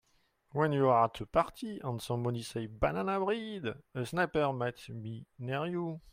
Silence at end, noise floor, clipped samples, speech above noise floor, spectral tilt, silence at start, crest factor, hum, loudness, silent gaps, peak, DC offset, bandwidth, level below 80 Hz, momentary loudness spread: 0 s; -72 dBFS; under 0.1%; 39 dB; -6.5 dB/octave; 0.55 s; 20 dB; none; -33 LUFS; none; -14 dBFS; under 0.1%; 16 kHz; -56 dBFS; 12 LU